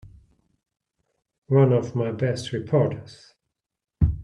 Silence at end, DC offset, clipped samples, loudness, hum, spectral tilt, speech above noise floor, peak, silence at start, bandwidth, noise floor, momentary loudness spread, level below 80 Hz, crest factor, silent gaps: 0 s; under 0.1%; under 0.1%; -23 LUFS; none; -8 dB/octave; 63 dB; -6 dBFS; 0.05 s; 10.5 kHz; -85 dBFS; 9 LU; -40 dBFS; 20 dB; 1.38-1.42 s